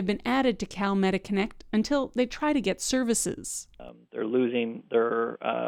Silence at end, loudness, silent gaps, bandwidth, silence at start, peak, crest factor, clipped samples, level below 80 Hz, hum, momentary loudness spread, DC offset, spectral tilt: 0 s; -27 LUFS; none; 17.5 kHz; 0 s; -12 dBFS; 16 dB; under 0.1%; -52 dBFS; none; 9 LU; under 0.1%; -4.5 dB/octave